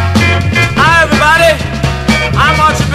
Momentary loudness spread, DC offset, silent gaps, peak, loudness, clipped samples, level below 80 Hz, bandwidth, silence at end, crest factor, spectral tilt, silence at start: 6 LU; under 0.1%; none; 0 dBFS; -9 LUFS; 0.7%; -22 dBFS; 14.5 kHz; 0 s; 10 dB; -5 dB/octave; 0 s